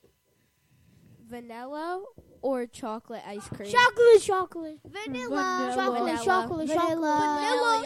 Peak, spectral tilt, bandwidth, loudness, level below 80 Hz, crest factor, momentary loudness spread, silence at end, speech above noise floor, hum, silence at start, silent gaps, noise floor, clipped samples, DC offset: -8 dBFS; -3.5 dB/octave; 14 kHz; -25 LUFS; -64 dBFS; 18 dB; 20 LU; 0 s; 43 dB; none; 1.3 s; none; -69 dBFS; under 0.1%; under 0.1%